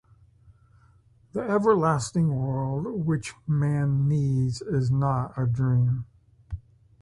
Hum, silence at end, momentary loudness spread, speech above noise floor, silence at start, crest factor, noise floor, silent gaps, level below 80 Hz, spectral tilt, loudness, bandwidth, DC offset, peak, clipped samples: none; 0.45 s; 12 LU; 34 dB; 1.35 s; 18 dB; -58 dBFS; none; -50 dBFS; -7.5 dB/octave; -25 LUFS; 11.5 kHz; under 0.1%; -8 dBFS; under 0.1%